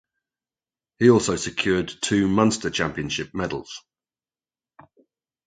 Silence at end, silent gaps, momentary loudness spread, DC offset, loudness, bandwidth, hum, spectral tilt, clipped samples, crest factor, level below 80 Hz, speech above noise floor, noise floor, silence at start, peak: 1.7 s; none; 12 LU; under 0.1%; -22 LUFS; 9.4 kHz; none; -4.5 dB/octave; under 0.1%; 22 dB; -50 dBFS; over 68 dB; under -90 dBFS; 1 s; -2 dBFS